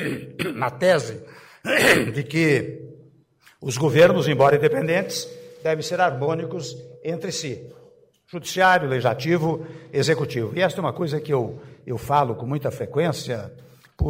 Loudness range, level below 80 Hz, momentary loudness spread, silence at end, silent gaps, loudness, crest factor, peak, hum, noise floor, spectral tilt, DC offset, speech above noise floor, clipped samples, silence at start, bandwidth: 5 LU; -46 dBFS; 17 LU; 0 s; none; -22 LUFS; 18 dB; -4 dBFS; none; -56 dBFS; -5 dB/octave; under 0.1%; 34 dB; under 0.1%; 0 s; 16 kHz